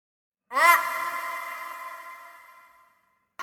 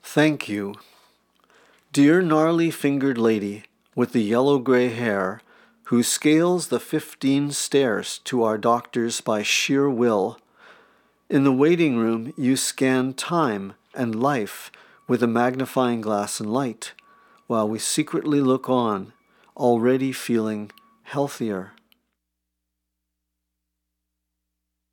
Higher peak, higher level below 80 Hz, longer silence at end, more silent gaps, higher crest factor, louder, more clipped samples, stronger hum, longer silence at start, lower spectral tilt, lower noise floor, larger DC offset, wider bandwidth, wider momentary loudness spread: about the same, -4 dBFS vs -4 dBFS; about the same, -80 dBFS vs -80 dBFS; second, 0 s vs 3.25 s; neither; first, 24 dB vs 18 dB; about the same, -24 LUFS vs -22 LUFS; neither; second, none vs 60 Hz at -50 dBFS; first, 0.5 s vs 0.05 s; second, 1 dB/octave vs -5 dB/octave; second, -68 dBFS vs -80 dBFS; neither; about the same, 19.5 kHz vs 18.5 kHz; first, 23 LU vs 11 LU